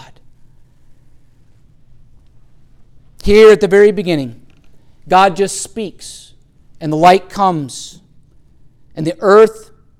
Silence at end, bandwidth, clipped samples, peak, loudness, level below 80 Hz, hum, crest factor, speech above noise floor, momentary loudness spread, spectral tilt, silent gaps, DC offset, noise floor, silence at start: 0.4 s; 13.5 kHz; under 0.1%; 0 dBFS; -11 LUFS; -38 dBFS; none; 14 dB; 34 dB; 21 LU; -5 dB/octave; none; under 0.1%; -45 dBFS; 3.25 s